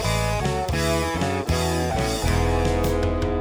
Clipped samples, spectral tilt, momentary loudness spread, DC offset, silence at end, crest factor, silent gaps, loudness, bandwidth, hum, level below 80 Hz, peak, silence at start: under 0.1%; -5 dB/octave; 2 LU; under 0.1%; 0 s; 14 dB; none; -23 LUFS; over 20 kHz; none; -30 dBFS; -8 dBFS; 0 s